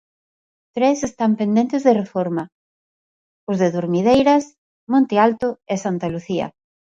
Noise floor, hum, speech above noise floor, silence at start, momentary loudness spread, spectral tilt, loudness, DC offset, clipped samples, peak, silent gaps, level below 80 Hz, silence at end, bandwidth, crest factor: under -90 dBFS; none; over 72 dB; 0.75 s; 12 LU; -6.5 dB/octave; -19 LUFS; under 0.1%; under 0.1%; -2 dBFS; 2.52-3.47 s, 4.58-4.87 s; -56 dBFS; 0.45 s; 7.8 kHz; 18 dB